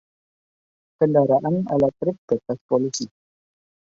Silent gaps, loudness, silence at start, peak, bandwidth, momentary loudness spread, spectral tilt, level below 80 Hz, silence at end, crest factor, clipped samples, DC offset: 2.18-2.28 s, 2.61-2.69 s; -22 LUFS; 1 s; -6 dBFS; 7.8 kHz; 9 LU; -6.5 dB/octave; -60 dBFS; 0.9 s; 18 dB; under 0.1%; under 0.1%